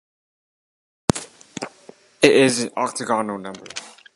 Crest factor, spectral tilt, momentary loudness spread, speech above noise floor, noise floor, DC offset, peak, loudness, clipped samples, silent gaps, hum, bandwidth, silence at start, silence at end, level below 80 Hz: 22 dB; -4 dB/octave; 19 LU; 29 dB; -48 dBFS; under 0.1%; 0 dBFS; -20 LUFS; under 0.1%; none; none; 11.5 kHz; 1.15 s; 0.25 s; -52 dBFS